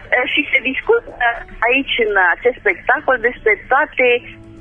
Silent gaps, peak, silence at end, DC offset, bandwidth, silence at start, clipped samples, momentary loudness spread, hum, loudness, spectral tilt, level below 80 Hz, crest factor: none; 0 dBFS; 0 s; under 0.1%; 3.7 kHz; 0 s; under 0.1%; 5 LU; none; -15 LUFS; -5.5 dB/octave; -42 dBFS; 16 dB